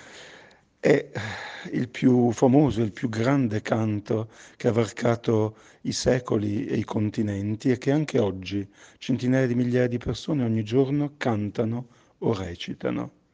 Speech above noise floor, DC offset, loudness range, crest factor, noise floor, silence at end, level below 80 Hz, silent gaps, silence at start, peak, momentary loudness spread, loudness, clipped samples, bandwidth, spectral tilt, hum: 28 dB; under 0.1%; 3 LU; 20 dB; -53 dBFS; 0.25 s; -54 dBFS; none; 0 s; -6 dBFS; 12 LU; -25 LUFS; under 0.1%; 9.6 kHz; -7 dB/octave; none